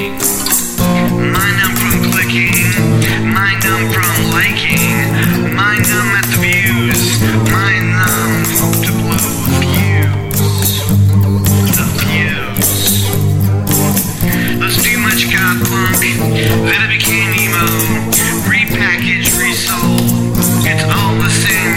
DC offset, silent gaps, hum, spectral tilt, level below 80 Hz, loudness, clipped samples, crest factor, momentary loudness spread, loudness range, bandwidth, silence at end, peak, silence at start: under 0.1%; none; none; -4 dB/octave; -30 dBFS; -11 LUFS; under 0.1%; 12 dB; 3 LU; 1 LU; 17 kHz; 0 s; 0 dBFS; 0 s